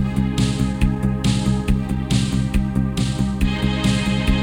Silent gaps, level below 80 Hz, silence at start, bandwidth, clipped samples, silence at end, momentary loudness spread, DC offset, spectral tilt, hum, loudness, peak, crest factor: none; -26 dBFS; 0 s; 16 kHz; under 0.1%; 0 s; 2 LU; under 0.1%; -6 dB/octave; none; -20 LUFS; -4 dBFS; 16 dB